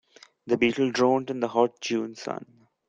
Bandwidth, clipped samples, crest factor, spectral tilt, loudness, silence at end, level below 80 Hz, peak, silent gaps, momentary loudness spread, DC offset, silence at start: 8.6 kHz; under 0.1%; 20 dB; -5 dB/octave; -26 LUFS; 0.45 s; -66 dBFS; -6 dBFS; none; 12 LU; under 0.1%; 0.45 s